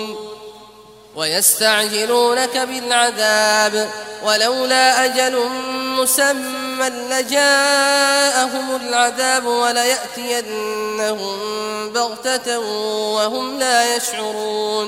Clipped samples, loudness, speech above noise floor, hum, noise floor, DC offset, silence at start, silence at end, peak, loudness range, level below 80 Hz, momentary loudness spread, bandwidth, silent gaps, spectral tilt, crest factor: under 0.1%; -17 LUFS; 25 dB; none; -43 dBFS; under 0.1%; 0 s; 0 s; 0 dBFS; 5 LU; -64 dBFS; 10 LU; 16 kHz; none; -0.5 dB/octave; 18 dB